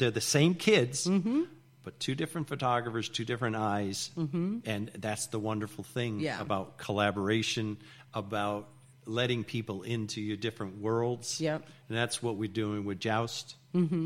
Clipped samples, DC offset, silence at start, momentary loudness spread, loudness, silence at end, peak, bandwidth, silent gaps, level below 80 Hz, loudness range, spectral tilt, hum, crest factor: under 0.1%; under 0.1%; 0 s; 10 LU; -32 LUFS; 0 s; -12 dBFS; 16.5 kHz; none; -68 dBFS; 3 LU; -4.5 dB/octave; none; 20 dB